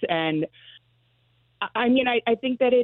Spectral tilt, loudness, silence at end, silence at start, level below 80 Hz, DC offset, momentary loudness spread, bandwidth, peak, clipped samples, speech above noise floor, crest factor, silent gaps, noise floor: -9.5 dB/octave; -24 LUFS; 0 s; 0 s; -64 dBFS; under 0.1%; 10 LU; 4.2 kHz; -8 dBFS; under 0.1%; 42 dB; 16 dB; none; -65 dBFS